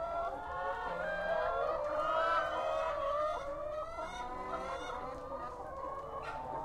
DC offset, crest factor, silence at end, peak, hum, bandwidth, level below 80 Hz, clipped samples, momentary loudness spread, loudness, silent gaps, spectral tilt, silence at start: under 0.1%; 16 dB; 0 s; -20 dBFS; none; 12.5 kHz; -56 dBFS; under 0.1%; 10 LU; -37 LUFS; none; -4.5 dB/octave; 0 s